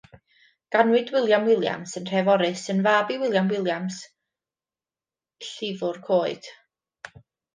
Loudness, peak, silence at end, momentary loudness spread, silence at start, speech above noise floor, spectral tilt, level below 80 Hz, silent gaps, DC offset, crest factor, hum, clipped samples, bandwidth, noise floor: -23 LUFS; -6 dBFS; 0.5 s; 19 LU; 0.7 s; over 67 dB; -5 dB/octave; -72 dBFS; none; under 0.1%; 20 dB; none; under 0.1%; 9.8 kHz; under -90 dBFS